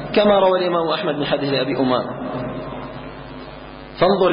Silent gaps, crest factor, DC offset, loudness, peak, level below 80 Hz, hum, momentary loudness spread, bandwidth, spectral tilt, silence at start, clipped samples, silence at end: none; 14 dB; under 0.1%; -19 LUFS; -4 dBFS; -46 dBFS; none; 20 LU; 5.4 kHz; -11 dB/octave; 0 s; under 0.1%; 0 s